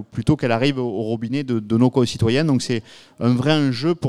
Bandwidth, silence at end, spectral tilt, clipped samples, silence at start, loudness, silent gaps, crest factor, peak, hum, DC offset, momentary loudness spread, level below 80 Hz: 12 kHz; 0 s; -6.5 dB/octave; under 0.1%; 0 s; -20 LUFS; none; 16 dB; -4 dBFS; none; under 0.1%; 7 LU; -48 dBFS